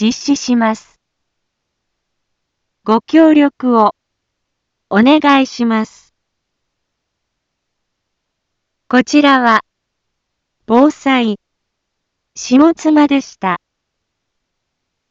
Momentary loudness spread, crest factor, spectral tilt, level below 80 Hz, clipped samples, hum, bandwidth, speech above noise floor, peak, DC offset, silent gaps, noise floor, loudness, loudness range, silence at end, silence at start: 10 LU; 16 dB; -4.5 dB/octave; -60 dBFS; under 0.1%; none; 7.6 kHz; 62 dB; 0 dBFS; under 0.1%; none; -74 dBFS; -12 LUFS; 6 LU; 1.55 s; 0 s